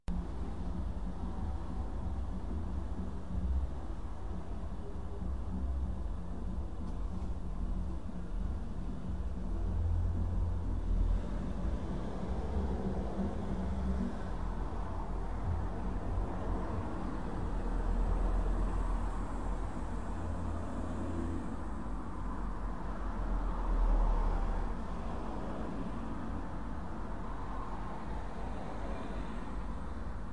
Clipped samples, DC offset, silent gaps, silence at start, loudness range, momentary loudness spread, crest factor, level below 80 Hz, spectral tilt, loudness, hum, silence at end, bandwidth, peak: under 0.1%; 0.9%; none; 0 s; 4 LU; 7 LU; 16 dB; -38 dBFS; -8 dB/octave; -39 LUFS; none; 0 s; 9.6 kHz; -20 dBFS